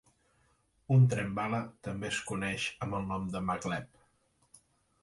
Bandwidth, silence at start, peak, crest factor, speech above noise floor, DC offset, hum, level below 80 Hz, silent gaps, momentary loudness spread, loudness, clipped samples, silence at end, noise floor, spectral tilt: 11.5 kHz; 0.9 s; -14 dBFS; 18 dB; 40 dB; under 0.1%; none; -60 dBFS; none; 12 LU; -32 LUFS; under 0.1%; 1.15 s; -72 dBFS; -6 dB/octave